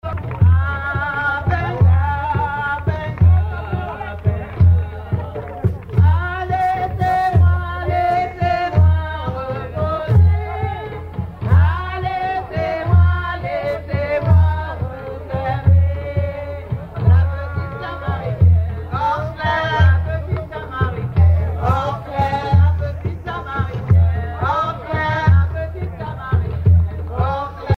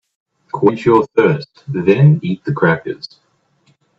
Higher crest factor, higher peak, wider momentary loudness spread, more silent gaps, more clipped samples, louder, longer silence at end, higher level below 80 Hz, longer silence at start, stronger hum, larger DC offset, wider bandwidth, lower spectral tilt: about the same, 16 dB vs 16 dB; about the same, -2 dBFS vs 0 dBFS; second, 11 LU vs 16 LU; neither; neither; second, -18 LUFS vs -14 LUFS; second, 0 s vs 0.9 s; first, -26 dBFS vs -58 dBFS; second, 0.05 s vs 0.55 s; neither; neither; second, 4.7 kHz vs 6.6 kHz; about the same, -8.5 dB/octave vs -9 dB/octave